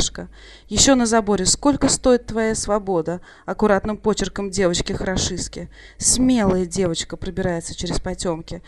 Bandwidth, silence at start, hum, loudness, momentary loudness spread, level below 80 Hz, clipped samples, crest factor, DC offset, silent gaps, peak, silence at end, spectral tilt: 15 kHz; 0 s; none; -20 LUFS; 12 LU; -36 dBFS; under 0.1%; 20 dB; under 0.1%; none; 0 dBFS; 0.1 s; -3.5 dB/octave